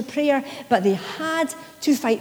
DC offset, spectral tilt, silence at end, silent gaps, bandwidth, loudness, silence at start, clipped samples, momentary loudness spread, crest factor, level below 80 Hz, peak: under 0.1%; -4.5 dB/octave; 0 s; none; over 20 kHz; -23 LUFS; 0 s; under 0.1%; 6 LU; 18 dB; -70 dBFS; -4 dBFS